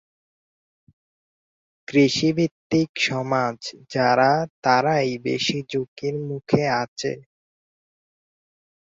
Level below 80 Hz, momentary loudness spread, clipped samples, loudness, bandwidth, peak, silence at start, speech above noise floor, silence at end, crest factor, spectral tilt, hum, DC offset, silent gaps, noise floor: -62 dBFS; 11 LU; under 0.1%; -22 LUFS; 7.8 kHz; -2 dBFS; 1.9 s; over 68 dB; 1.8 s; 22 dB; -5 dB/octave; none; under 0.1%; 2.51-2.70 s, 2.89-2.95 s, 4.50-4.62 s, 5.88-5.96 s, 6.88-6.96 s; under -90 dBFS